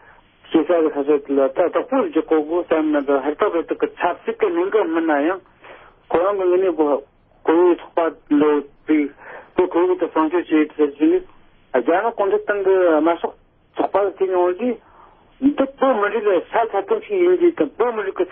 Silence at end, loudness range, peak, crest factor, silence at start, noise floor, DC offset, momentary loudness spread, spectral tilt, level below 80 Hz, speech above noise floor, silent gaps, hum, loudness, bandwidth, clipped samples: 0 s; 2 LU; -4 dBFS; 16 dB; 0.5 s; -49 dBFS; under 0.1%; 7 LU; -10 dB/octave; -58 dBFS; 31 dB; none; none; -19 LUFS; 3.7 kHz; under 0.1%